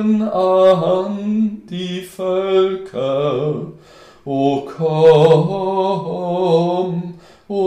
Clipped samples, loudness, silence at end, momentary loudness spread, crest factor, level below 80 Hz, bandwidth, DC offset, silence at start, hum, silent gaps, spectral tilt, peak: under 0.1%; -17 LUFS; 0 s; 14 LU; 16 dB; -56 dBFS; 12.5 kHz; under 0.1%; 0 s; none; none; -8 dB/octave; 0 dBFS